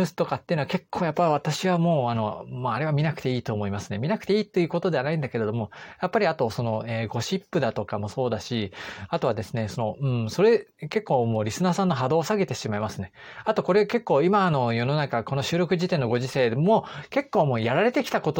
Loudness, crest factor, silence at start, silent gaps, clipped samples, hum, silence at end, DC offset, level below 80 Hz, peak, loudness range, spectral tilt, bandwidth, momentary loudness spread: -25 LUFS; 16 dB; 0 s; none; under 0.1%; none; 0 s; under 0.1%; -60 dBFS; -8 dBFS; 4 LU; -6.5 dB/octave; 17 kHz; 8 LU